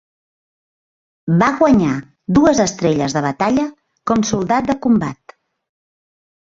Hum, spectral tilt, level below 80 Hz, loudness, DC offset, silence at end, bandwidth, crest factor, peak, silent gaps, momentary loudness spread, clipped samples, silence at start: none; -6 dB/octave; -46 dBFS; -16 LUFS; under 0.1%; 1.4 s; 7.8 kHz; 16 dB; -2 dBFS; none; 12 LU; under 0.1%; 1.25 s